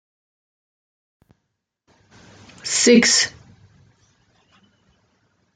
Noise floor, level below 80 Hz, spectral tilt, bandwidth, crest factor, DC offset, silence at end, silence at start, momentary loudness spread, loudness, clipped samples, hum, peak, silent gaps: -77 dBFS; -66 dBFS; -2 dB/octave; 9.6 kHz; 22 dB; under 0.1%; 2.25 s; 2.65 s; 12 LU; -15 LUFS; under 0.1%; none; -2 dBFS; none